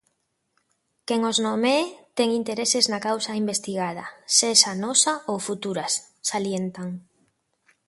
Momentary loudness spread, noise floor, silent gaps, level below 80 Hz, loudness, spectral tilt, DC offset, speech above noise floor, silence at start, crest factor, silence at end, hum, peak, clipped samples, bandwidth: 13 LU; -73 dBFS; none; -72 dBFS; -22 LUFS; -2 dB/octave; under 0.1%; 49 dB; 1.1 s; 24 dB; 0.85 s; none; -2 dBFS; under 0.1%; 12 kHz